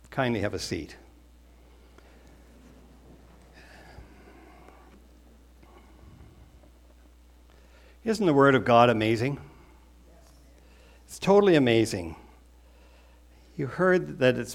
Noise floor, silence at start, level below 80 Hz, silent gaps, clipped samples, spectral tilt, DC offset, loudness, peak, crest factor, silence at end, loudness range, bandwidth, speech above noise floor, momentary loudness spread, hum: -54 dBFS; 0.1 s; -54 dBFS; none; under 0.1%; -6 dB/octave; under 0.1%; -24 LUFS; -4 dBFS; 24 dB; 0 s; 11 LU; 15.5 kHz; 31 dB; 20 LU; none